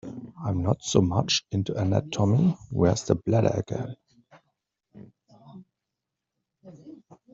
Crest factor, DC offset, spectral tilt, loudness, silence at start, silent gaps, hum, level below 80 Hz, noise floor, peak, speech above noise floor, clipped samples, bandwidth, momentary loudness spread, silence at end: 24 dB; under 0.1%; -6.5 dB/octave; -25 LUFS; 0.05 s; none; none; -56 dBFS; -85 dBFS; -4 dBFS; 61 dB; under 0.1%; 7.8 kHz; 12 LU; 0.2 s